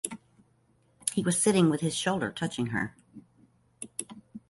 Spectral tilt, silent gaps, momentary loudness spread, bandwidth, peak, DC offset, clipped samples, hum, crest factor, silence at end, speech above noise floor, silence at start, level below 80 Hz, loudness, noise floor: -4.5 dB/octave; none; 16 LU; 12 kHz; -8 dBFS; under 0.1%; under 0.1%; none; 24 dB; 0.1 s; 39 dB; 0.05 s; -64 dBFS; -29 LUFS; -67 dBFS